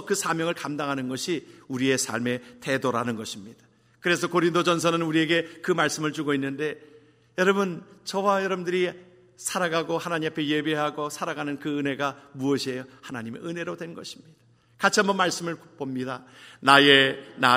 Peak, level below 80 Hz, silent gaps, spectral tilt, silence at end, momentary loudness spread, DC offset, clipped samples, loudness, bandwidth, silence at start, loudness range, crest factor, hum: 0 dBFS; -70 dBFS; none; -3.5 dB/octave; 0 s; 13 LU; under 0.1%; under 0.1%; -25 LUFS; 16 kHz; 0 s; 4 LU; 26 dB; none